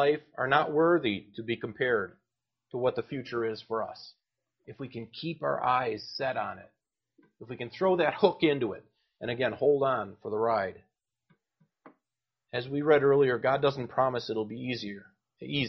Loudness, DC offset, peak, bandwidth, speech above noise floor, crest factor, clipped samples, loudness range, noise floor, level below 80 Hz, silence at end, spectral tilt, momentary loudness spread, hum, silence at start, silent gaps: -29 LUFS; under 0.1%; -8 dBFS; 6.2 kHz; 61 dB; 22 dB; under 0.1%; 6 LU; -90 dBFS; -68 dBFS; 0 s; -4 dB/octave; 16 LU; none; 0 s; none